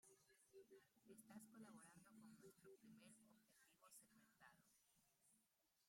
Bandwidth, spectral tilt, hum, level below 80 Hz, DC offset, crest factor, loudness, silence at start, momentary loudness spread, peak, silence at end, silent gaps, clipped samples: 16 kHz; -4 dB/octave; none; under -90 dBFS; under 0.1%; 18 dB; -67 LUFS; 0 s; 5 LU; -52 dBFS; 0 s; none; under 0.1%